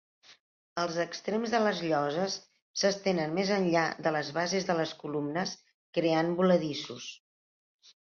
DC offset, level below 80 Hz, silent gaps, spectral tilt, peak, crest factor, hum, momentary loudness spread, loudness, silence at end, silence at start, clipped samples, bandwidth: under 0.1%; -74 dBFS; 0.40-0.76 s, 2.62-2.74 s, 5.74-5.93 s; -5 dB/octave; -12 dBFS; 18 dB; none; 11 LU; -30 LUFS; 0.95 s; 0.3 s; under 0.1%; 7.2 kHz